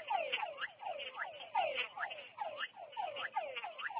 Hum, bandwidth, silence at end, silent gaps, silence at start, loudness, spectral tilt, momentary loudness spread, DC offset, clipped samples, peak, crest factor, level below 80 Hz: none; 4 kHz; 0 s; none; 0 s; -41 LUFS; 3 dB/octave; 7 LU; under 0.1%; under 0.1%; -22 dBFS; 20 dB; -88 dBFS